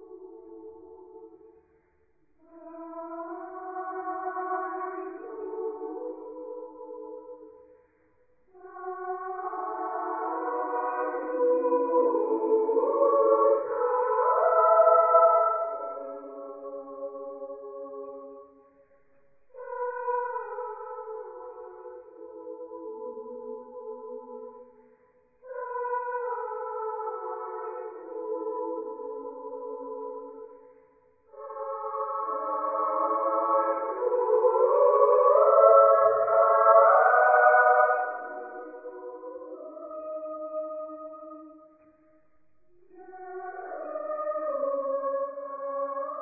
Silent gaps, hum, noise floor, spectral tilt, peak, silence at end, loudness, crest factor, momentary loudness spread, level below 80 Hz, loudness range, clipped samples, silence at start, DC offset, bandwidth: none; none; -69 dBFS; -9.5 dB/octave; -6 dBFS; 0 s; -25 LUFS; 22 dB; 23 LU; -80 dBFS; 21 LU; under 0.1%; 0 s; under 0.1%; 2.6 kHz